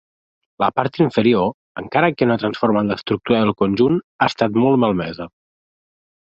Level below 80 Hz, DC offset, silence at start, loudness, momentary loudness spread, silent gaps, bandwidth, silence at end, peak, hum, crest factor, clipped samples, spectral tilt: -52 dBFS; under 0.1%; 0.6 s; -18 LUFS; 8 LU; 1.54-1.75 s, 4.04-4.19 s; 7.6 kHz; 1 s; 0 dBFS; none; 18 dB; under 0.1%; -7.5 dB/octave